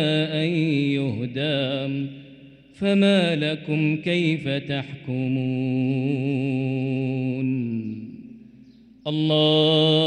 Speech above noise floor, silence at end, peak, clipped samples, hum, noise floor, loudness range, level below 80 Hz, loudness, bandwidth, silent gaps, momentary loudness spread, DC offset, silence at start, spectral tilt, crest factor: 27 dB; 0 s; -8 dBFS; under 0.1%; none; -49 dBFS; 3 LU; -64 dBFS; -23 LUFS; 9.4 kHz; none; 12 LU; under 0.1%; 0 s; -7 dB/octave; 16 dB